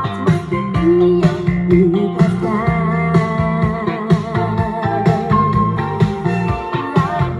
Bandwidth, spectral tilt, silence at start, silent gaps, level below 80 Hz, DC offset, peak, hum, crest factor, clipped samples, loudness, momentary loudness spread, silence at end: 10 kHz; -8.5 dB/octave; 0 s; none; -34 dBFS; under 0.1%; -2 dBFS; none; 14 dB; under 0.1%; -16 LUFS; 6 LU; 0 s